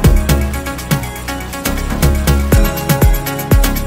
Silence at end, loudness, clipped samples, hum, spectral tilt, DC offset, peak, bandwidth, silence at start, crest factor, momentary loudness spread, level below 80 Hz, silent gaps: 0 s; -15 LUFS; under 0.1%; none; -5.5 dB/octave; under 0.1%; 0 dBFS; 16.5 kHz; 0 s; 12 dB; 8 LU; -16 dBFS; none